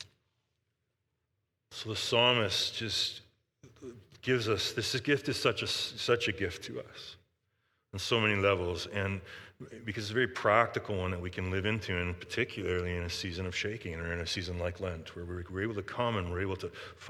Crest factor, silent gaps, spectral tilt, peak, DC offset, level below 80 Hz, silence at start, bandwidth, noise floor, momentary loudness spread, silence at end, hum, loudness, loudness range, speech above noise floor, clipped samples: 24 dB; none; -4 dB/octave; -8 dBFS; under 0.1%; -58 dBFS; 0 s; 15.5 kHz; -82 dBFS; 17 LU; 0 s; none; -32 LUFS; 5 LU; 49 dB; under 0.1%